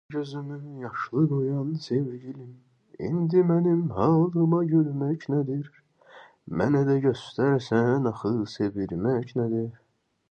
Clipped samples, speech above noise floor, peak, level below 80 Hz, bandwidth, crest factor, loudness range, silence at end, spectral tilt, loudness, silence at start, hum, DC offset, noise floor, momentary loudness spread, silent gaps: under 0.1%; 27 dB; -8 dBFS; -60 dBFS; 8.2 kHz; 16 dB; 3 LU; 0.6 s; -9 dB/octave; -26 LUFS; 0.1 s; none; under 0.1%; -52 dBFS; 13 LU; none